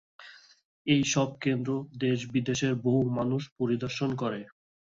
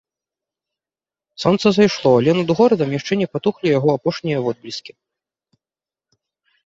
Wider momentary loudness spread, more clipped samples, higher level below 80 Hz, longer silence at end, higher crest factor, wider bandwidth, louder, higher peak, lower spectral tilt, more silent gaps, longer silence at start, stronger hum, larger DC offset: about the same, 7 LU vs 9 LU; neither; second, -64 dBFS vs -58 dBFS; second, 0.45 s vs 1.75 s; about the same, 18 dB vs 18 dB; about the same, 7.8 kHz vs 7.8 kHz; second, -29 LUFS vs -17 LUFS; second, -12 dBFS vs -2 dBFS; about the same, -5.5 dB/octave vs -6.5 dB/octave; first, 0.65-0.85 s, 3.52-3.56 s vs none; second, 0.2 s vs 1.4 s; neither; neither